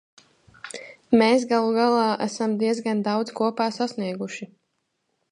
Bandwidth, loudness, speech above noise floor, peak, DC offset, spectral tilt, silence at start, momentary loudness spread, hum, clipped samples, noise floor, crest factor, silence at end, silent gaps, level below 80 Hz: 11 kHz; -23 LUFS; 53 dB; -6 dBFS; under 0.1%; -5 dB/octave; 0.65 s; 18 LU; none; under 0.1%; -75 dBFS; 18 dB; 0.85 s; none; -70 dBFS